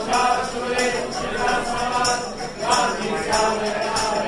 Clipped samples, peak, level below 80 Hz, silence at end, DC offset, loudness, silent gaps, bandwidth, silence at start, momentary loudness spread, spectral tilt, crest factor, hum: under 0.1%; -6 dBFS; -42 dBFS; 0 s; under 0.1%; -22 LUFS; none; 11.5 kHz; 0 s; 5 LU; -2.5 dB/octave; 16 dB; none